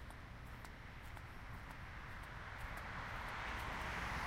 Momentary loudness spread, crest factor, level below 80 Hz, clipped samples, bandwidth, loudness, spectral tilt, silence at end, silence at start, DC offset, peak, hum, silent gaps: 10 LU; 16 dB; -54 dBFS; under 0.1%; 16 kHz; -48 LUFS; -4.5 dB/octave; 0 s; 0 s; under 0.1%; -32 dBFS; none; none